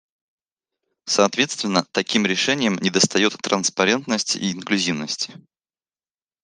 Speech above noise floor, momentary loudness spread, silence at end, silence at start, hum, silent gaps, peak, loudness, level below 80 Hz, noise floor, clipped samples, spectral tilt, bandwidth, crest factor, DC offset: over 69 dB; 7 LU; 1.1 s; 1.05 s; none; none; -2 dBFS; -20 LUFS; -66 dBFS; under -90 dBFS; under 0.1%; -3 dB/octave; 10.5 kHz; 22 dB; under 0.1%